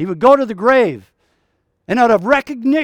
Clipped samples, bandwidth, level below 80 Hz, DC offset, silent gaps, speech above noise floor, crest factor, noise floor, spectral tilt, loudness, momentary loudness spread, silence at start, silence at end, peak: under 0.1%; 10 kHz; -52 dBFS; under 0.1%; none; 52 dB; 14 dB; -66 dBFS; -6.5 dB/octave; -14 LUFS; 8 LU; 0 s; 0 s; 0 dBFS